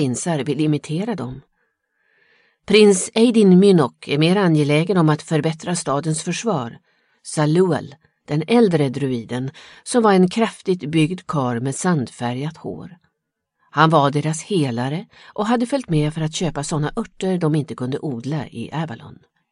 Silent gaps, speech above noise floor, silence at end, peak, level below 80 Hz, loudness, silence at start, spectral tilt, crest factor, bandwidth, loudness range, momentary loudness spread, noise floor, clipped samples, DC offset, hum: none; 59 dB; 0.4 s; 0 dBFS; -52 dBFS; -19 LUFS; 0 s; -6 dB/octave; 18 dB; 11.5 kHz; 7 LU; 13 LU; -77 dBFS; under 0.1%; under 0.1%; none